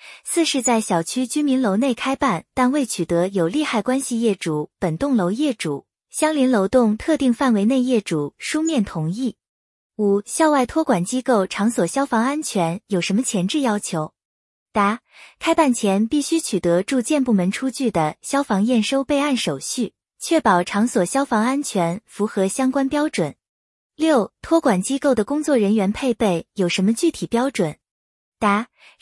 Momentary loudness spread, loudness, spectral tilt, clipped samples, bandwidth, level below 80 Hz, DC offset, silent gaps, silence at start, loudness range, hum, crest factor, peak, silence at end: 7 LU; -20 LUFS; -5 dB/octave; under 0.1%; 12 kHz; -54 dBFS; under 0.1%; 9.49-9.90 s, 14.25-14.66 s, 23.49-23.90 s, 27.91-28.32 s; 0.05 s; 2 LU; none; 18 dB; -2 dBFS; 0.35 s